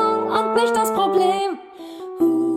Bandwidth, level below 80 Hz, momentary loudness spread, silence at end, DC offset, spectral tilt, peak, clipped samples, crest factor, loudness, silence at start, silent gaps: 16.5 kHz; -64 dBFS; 16 LU; 0 s; under 0.1%; -4.5 dB/octave; -6 dBFS; under 0.1%; 14 dB; -19 LUFS; 0 s; none